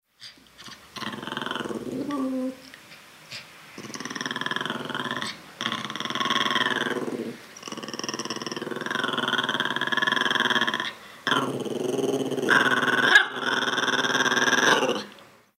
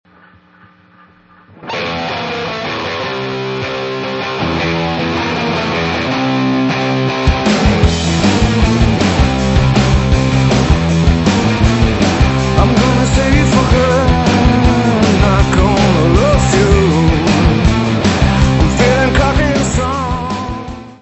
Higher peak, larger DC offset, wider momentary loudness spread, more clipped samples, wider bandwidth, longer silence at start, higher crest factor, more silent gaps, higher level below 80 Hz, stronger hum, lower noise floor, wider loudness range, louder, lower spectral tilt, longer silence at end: second, -4 dBFS vs 0 dBFS; neither; first, 20 LU vs 8 LU; neither; first, 16 kHz vs 8.4 kHz; second, 0.2 s vs 1.65 s; first, 24 dB vs 12 dB; neither; second, -70 dBFS vs -20 dBFS; neither; first, -50 dBFS vs -45 dBFS; first, 12 LU vs 7 LU; second, -25 LUFS vs -13 LUFS; second, -2.5 dB/octave vs -6 dB/octave; first, 0.35 s vs 0.05 s